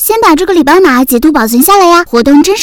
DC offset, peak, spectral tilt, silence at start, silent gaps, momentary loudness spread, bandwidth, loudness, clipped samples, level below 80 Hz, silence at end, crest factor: 0.7%; 0 dBFS; -3 dB/octave; 0 s; none; 3 LU; over 20 kHz; -6 LUFS; 5%; -34 dBFS; 0 s; 6 dB